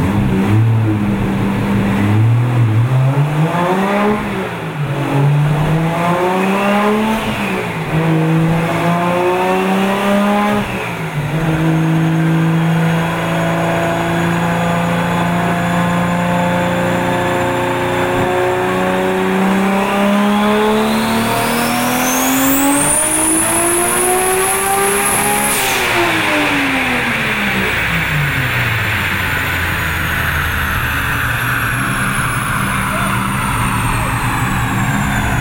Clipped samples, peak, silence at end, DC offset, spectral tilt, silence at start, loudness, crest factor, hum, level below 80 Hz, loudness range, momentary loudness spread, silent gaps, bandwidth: under 0.1%; -2 dBFS; 0 s; under 0.1%; -4.5 dB/octave; 0 s; -14 LUFS; 12 dB; none; -34 dBFS; 3 LU; 4 LU; none; 16.5 kHz